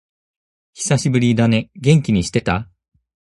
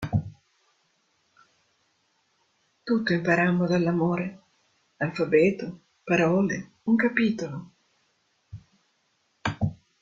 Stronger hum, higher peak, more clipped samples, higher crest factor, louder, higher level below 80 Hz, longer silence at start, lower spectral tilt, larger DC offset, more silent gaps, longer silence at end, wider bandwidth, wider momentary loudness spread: neither; first, 0 dBFS vs -6 dBFS; neither; about the same, 18 dB vs 22 dB; first, -17 LUFS vs -25 LUFS; first, -42 dBFS vs -58 dBFS; first, 0.75 s vs 0 s; about the same, -6 dB/octave vs -7 dB/octave; neither; neither; first, 0.7 s vs 0.25 s; first, 11.5 kHz vs 7.6 kHz; second, 7 LU vs 21 LU